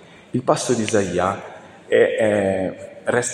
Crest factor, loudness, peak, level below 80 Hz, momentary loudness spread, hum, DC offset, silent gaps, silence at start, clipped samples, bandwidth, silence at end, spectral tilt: 18 dB; -20 LUFS; -2 dBFS; -56 dBFS; 11 LU; none; under 0.1%; none; 0.35 s; under 0.1%; 12.5 kHz; 0 s; -4.5 dB/octave